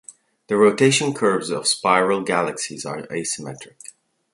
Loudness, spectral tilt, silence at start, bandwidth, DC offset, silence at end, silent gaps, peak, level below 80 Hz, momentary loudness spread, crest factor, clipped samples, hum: -20 LUFS; -3.5 dB/octave; 0.1 s; 11.5 kHz; under 0.1%; 0.45 s; none; -2 dBFS; -64 dBFS; 13 LU; 20 dB; under 0.1%; none